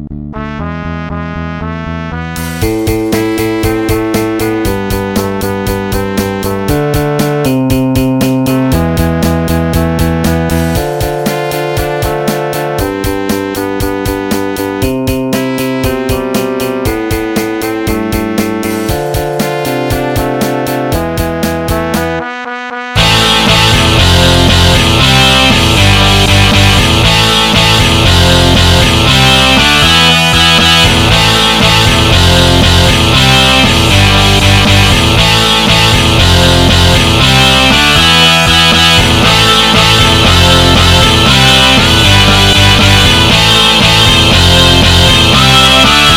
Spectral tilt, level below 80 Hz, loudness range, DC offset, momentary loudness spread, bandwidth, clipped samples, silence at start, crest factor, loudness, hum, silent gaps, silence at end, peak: -4 dB/octave; -20 dBFS; 9 LU; under 0.1%; 10 LU; 17.5 kHz; 0.8%; 0 s; 8 dB; -7 LUFS; none; none; 0 s; 0 dBFS